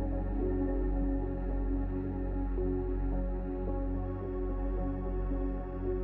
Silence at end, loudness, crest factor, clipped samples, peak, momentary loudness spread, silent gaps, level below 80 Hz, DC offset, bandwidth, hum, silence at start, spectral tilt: 0 s; -35 LUFS; 10 dB; under 0.1%; -22 dBFS; 4 LU; none; -34 dBFS; under 0.1%; 2.9 kHz; none; 0 s; -12.5 dB/octave